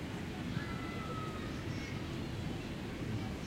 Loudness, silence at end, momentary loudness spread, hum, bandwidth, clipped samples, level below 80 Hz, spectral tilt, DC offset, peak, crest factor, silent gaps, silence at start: -41 LUFS; 0 s; 2 LU; none; 16 kHz; under 0.1%; -52 dBFS; -6 dB/octave; under 0.1%; -24 dBFS; 16 dB; none; 0 s